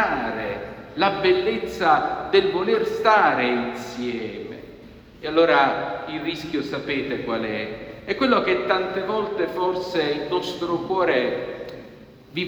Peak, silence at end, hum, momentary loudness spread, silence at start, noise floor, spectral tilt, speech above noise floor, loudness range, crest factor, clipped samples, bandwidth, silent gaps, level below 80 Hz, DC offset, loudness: -4 dBFS; 0 s; none; 15 LU; 0 s; -45 dBFS; -5.5 dB/octave; 23 dB; 4 LU; 20 dB; under 0.1%; over 20 kHz; none; -54 dBFS; under 0.1%; -22 LUFS